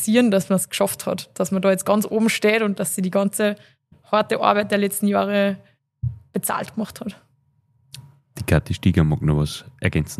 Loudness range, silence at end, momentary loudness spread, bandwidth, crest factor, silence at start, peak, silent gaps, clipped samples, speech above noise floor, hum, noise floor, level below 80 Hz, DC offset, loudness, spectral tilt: 6 LU; 0.05 s; 12 LU; 15 kHz; 20 dB; 0 s; -2 dBFS; none; under 0.1%; 43 dB; none; -63 dBFS; -42 dBFS; under 0.1%; -21 LUFS; -5.5 dB/octave